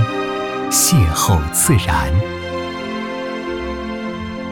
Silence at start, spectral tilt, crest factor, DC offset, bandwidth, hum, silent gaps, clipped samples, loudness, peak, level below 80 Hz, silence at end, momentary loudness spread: 0 s; -4 dB/octave; 16 dB; under 0.1%; 18 kHz; none; none; under 0.1%; -18 LUFS; -2 dBFS; -30 dBFS; 0 s; 12 LU